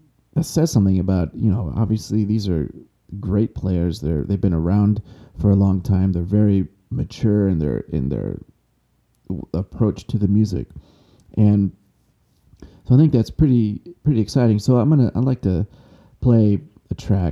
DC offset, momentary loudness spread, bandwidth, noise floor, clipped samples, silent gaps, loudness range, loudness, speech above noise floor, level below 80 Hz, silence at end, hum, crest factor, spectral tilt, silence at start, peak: under 0.1%; 11 LU; 12.5 kHz; -64 dBFS; under 0.1%; none; 5 LU; -19 LUFS; 46 dB; -38 dBFS; 0 s; none; 16 dB; -8.5 dB/octave; 0.35 s; -4 dBFS